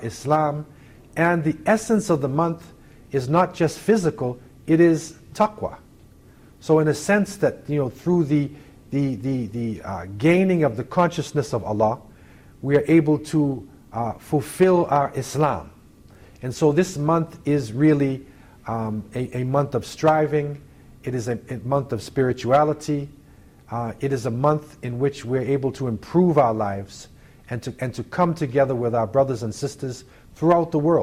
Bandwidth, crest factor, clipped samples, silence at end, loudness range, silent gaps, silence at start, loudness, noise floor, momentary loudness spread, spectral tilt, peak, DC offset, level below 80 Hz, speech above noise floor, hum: 15.5 kHz; 18 dB; under 0.1%; 0 s; 3 LU; none; 0 s; -22 LUFS; -49 dBFS; 14 LU; -7 dB/octave; -6 dBFS; under 0.1%; -52 dBFS; 28 dB; none